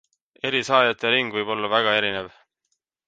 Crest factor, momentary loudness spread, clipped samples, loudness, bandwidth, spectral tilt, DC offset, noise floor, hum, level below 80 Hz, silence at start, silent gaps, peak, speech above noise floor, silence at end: 20 dB; 11 LU; under 0.1%; -21 LUFS; 9.2 kHz; -3.5 dB/octave; under 0.1%; -76 dBFS; none; -66 dBFS; 0.45 s; none; -4 dBFS; 54 dB; 0.8 s